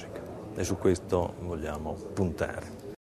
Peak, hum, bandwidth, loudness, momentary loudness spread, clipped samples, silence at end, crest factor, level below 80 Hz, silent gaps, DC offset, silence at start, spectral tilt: -12 dBFS; none; 13.5 kHz; -32 LUFS; 13 LU; under 0.1%; 0.15 s; 20 dB; -48 dBFS; none; under 0.1%; 0 s; -6 dB/octave